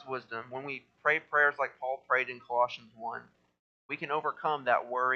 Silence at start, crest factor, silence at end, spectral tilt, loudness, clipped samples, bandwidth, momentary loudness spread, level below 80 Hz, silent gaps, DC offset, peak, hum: 0 s; 20 dB; 0 s; -5 dB/octave; -31 LUFS; under 0.1%; 7 kHz; 14 LU; -84 dBFS; 3.59-3.89 s; under 0.1%; -12 dBFS; none